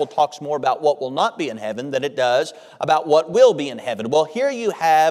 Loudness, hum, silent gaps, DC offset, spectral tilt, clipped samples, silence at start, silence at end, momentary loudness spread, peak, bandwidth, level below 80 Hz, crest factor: -19 LUFS; none; none; under 0.1%; -4 dB/octave; under 0.1%; 0 s; 0 s; 11 LU; -2 dBFS; 14.5 kHz; -70 dBFS; 18 dB